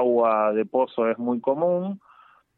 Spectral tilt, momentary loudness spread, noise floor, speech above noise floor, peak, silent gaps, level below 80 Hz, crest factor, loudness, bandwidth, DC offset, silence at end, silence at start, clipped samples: -11 dB/octave; 8 LU; -55 dBFS; 32 dB; -8 dBFS; none; -78 dBFS; 14 dB; -23 LUFS; 4.2 kHz; under 0.1%; 0.6 s; 0 s; under 0.1%